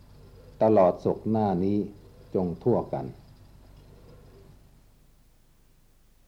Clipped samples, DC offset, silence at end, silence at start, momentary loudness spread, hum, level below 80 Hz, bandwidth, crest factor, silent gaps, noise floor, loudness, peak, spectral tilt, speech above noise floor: under 0.1%; under 0.1%; 3.15 s; 0.6 s; 14 LU; none; -54 dBFS; 9.8 kHz; 20 dB; none; -59 dBFS; -26 LUFS; -10 dBFS; -10 dB/octave; 34 dB